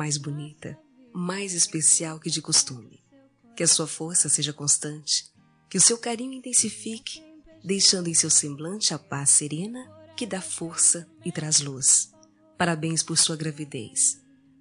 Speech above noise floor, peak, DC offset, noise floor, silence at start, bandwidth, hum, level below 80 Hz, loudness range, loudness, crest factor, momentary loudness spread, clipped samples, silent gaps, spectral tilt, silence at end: 32 dB; -6 dBFS; under 0.1%; -57 dBFS; 0 s; 13 kHz; none; -70 dBFS; 2 LU; -22 LUFS; 20 dB; 17 LU; under 0.1%; none; -2 dB/octave; 0.45 s